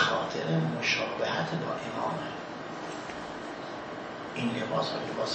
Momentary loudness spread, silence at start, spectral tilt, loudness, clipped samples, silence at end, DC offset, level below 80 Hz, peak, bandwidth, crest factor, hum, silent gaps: 11 LU; 0 s; -5 dB/octave; -32 LUFS; under 0.1%; 0 s; under 0.1%; -66 dBFS; -10 dBFS; 8.4 kHz; 22 dB; none; none